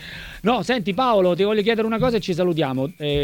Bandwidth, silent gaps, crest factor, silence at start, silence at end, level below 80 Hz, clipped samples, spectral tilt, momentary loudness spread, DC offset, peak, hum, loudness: 18.5 kHz; none; 14 dB; 0 s; 0 s; -44 dBFS; under 0.1%; -6.5 dB/octave; 6 LU; under 0.1%; -6 dBFS; none; -20 LUFS